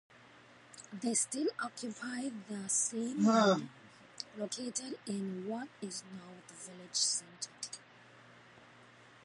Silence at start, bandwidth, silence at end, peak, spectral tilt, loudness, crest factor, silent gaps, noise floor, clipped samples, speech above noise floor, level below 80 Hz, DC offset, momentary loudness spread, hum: 0.2 s; 11.5 kHz; 0.2 s; -16 dBFS; -3 dB/octave; -35 LUFS; 22 dB; none; -59 dBFS; under 0.1%; 23 dB; -84 dBFS; under 0.1%; 20 LU; none